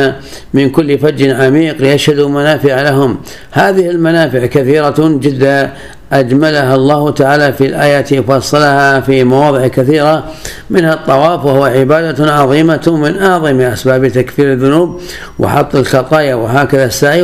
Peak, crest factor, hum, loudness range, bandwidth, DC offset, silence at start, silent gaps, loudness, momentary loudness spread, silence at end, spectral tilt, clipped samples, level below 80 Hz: 0 dBFS; 10 dB; none; 2 LU; 15 kHz; 1%; 0 s; none; -9 LUFS; 4 LU; 0 s; -6 dB/octave; 0.7%; -38 dBFS